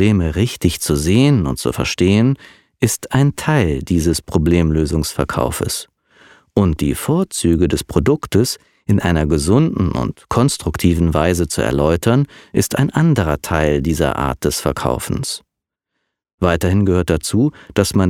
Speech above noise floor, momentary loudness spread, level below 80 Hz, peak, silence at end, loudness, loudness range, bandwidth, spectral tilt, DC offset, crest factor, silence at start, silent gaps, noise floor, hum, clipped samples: 64 dB; 6 LU; -30 dBFS; 0 dBFS; 0 s; -17 LUFS; 3 LU; 17 kHz; -6 dB/octave; under 0.1%; 16 dB; 0 s; 16.34-16.38 s; -80 dBFS; none; under 0.1%